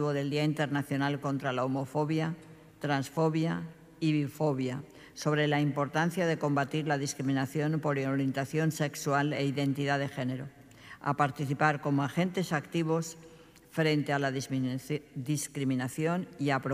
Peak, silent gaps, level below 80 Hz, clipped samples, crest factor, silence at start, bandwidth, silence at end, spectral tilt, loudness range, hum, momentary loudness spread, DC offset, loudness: -12 dBFS; none; -70 dBFS; under 0.1%; 20 dB; 0 s; 15.5 kHz; 0 s; -6 dB/octave; 2 LU; none; 8 LU; under 0.1%; -31 LUFS